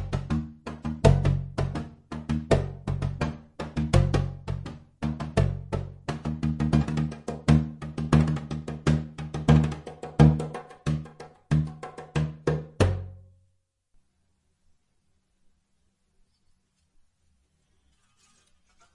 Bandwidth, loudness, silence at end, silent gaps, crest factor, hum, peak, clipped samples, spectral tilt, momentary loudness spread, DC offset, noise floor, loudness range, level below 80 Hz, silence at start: 11 kHz; -27 LUFS; 5.75 s; none; 24 dB; none; -4 dBFS; under 0.1%; -7.5 dB/octave; 14 LU; under 0.1%; -71 dBFS; 7 LU; -38 dBFS; 0 s